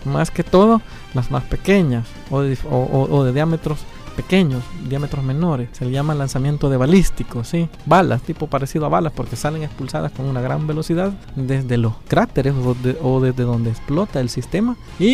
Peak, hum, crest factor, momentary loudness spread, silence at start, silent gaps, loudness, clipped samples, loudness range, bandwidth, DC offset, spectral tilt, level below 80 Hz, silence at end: -2 dBFS; none; 16 dB; 9 LU; 0 s; none; -19 LUFS; under 0.1%; 3 LU; 15 kHz; under 0.1%; -7 dB/octave; -32 dBFS; 0 s